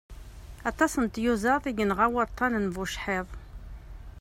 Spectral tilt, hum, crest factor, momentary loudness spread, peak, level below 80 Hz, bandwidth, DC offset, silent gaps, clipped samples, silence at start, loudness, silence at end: -5 dB/octave; none; 20 dB; 22 LU; -10 dBFS; -44 dBFS; 16 kHz; under 0.1%; none; under 0.1%; 0.1 s; -27 LUFS; 0 s